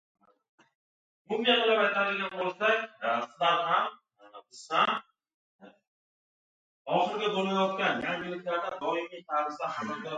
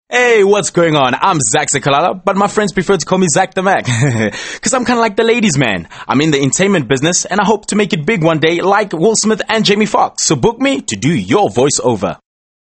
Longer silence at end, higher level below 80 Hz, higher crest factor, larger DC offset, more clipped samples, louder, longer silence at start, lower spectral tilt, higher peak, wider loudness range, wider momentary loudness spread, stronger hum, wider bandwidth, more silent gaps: second, 0 s vs 0.45 s; second, -78 dBFS vs -46 dBFS; first, 20 dB vs 12 dB; neither; neither; second, -29 LUFS vs -12 LUFS; first, 1.3 s vs 0.1 s; about the same, -4.5 dB/octave vs -4 dB/octave; second, -10 dBFS vs 0 dBFS; first, 5 LU vs 1 LU; first, 10 LU vs 4 LU; neither; about the same, 9.2 kHz vs 9 kHz; first, 5.34-5.59 s, 5.87-6.85 s vs none